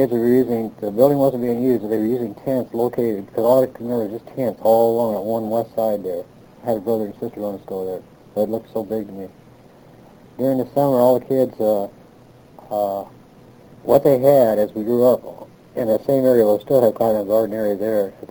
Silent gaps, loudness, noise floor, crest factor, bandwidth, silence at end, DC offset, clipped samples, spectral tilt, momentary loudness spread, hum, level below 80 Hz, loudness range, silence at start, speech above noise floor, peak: none; -19 LUFS; -47 dBFS; 18 dB; over 20 kHz; 0.05 s; under 0.1%; under 0.1%; -8 dB/octave; 13 LU; none; -56 dBFS; 8 LU; 0 s; 28 dB; -2 dBFS